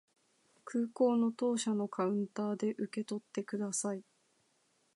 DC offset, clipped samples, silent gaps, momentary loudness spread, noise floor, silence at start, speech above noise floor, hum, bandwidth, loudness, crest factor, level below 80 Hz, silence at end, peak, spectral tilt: under 0.1%; under 0.1%; none; 9 LU; -75 dBFS; 0.65 s; 40 dB; none; 11.5 kHz; -35 LUFS; 18 dB; -88 dBFS; 0.95 s; -18 dBFS; -5 dB/octave